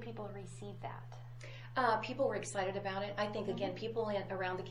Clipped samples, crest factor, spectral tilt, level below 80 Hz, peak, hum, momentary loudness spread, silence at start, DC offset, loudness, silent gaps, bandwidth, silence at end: under 0.1%; 20 dB; -5 dB/octave; -66 dBFS; -18 dBFS; none; 15 LU; 0 s; under 0.1%; -38 LUFS; none; 16 kHz; 0 s